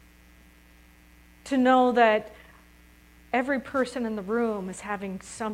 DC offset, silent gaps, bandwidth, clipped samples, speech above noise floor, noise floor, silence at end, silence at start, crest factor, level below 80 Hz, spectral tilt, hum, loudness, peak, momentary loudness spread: under 0.1%; none; 14.5 kHz; under 0.1%; 30 dB; -55 dBFS; 0 s; 1.45 s; 22 dB; -58 dBFS; -5 dB/octave; none; -26 LUFS; -6 dBFS; 14 LU